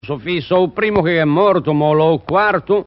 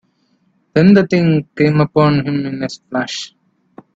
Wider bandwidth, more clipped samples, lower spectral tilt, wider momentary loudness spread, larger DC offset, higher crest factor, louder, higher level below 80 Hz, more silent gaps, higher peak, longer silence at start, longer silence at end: second, 5.8 kHz vs 8 kHz; neither; second, -5 dB/octave vs -7 dB/octave; second, 3 LU vs 13 LU; neither; about the same, 14 dB vs 16 dB; about the same, -15 LUFS vs -14 LUFS; first, -46 dBFS vs -52 dBFS; neither; about the same, 0 dBFS vs 0 dBFS; second, 0.05 s vs 0.75 s; second, 0.05 s vs 0.7 s